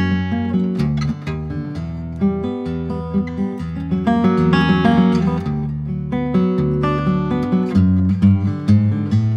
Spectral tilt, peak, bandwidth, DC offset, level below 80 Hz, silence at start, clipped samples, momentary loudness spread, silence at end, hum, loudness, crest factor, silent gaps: -9 dB/octave; -2 dBFS; 6.8 kHz; under 0.1%; -38 dBFS; 0 s; under 0.1%; 10 LU; 0 s; none; -18 LUFS; 16 dB; none